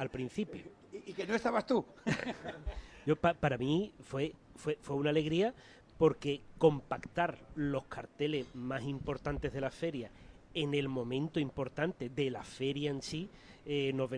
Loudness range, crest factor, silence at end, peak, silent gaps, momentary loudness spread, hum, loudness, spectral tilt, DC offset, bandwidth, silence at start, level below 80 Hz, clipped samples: 4 LU; 22 dB; 0 s; -14 dBFS; none; 12 LU; none; -36 LUFS; -6.5 dB/octave; under 0.1%; 10.5 kHz; 0 s; -56 dBFS; under 0.1%